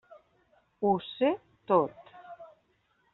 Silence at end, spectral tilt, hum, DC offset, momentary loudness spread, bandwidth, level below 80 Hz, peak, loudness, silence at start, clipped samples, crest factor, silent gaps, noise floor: 0.7 s; -5 dB/octave; none; under 0.1%; 22 LU; 4.2 kHz; -72 dBFS; -10 dBFS; -29 LUFS; 0.8 s; under 0.1%; 22 dB; none; -71 dBFS